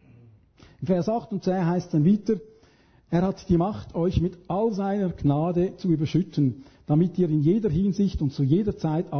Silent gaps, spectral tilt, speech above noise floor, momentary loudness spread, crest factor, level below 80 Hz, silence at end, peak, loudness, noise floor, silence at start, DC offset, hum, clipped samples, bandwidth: none; -9 dB/octave; 34 dB; 5 LU; 16 dB; -44 dBFS; 0 s; -10 dBFS; -25 LUFS; -58 dBFS; 0.8 s; under 0.1%; none; under 0.1%; 6.6 kHz